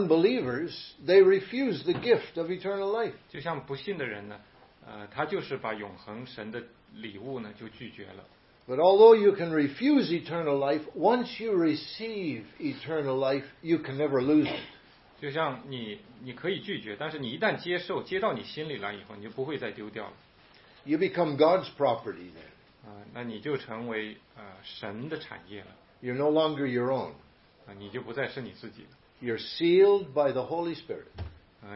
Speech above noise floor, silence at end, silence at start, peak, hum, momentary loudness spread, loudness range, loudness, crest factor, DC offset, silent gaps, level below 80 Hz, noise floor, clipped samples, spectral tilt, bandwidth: 29 dB; 0 s; 0 s; -6 dBFS; none; 20 LU; 13 LU; -28 LUFS; 22 dB; under 0.1%; none; -64 dBFS; -57 dBFS; under 0.1%; -9.5 dB/octave; 5.8 kHz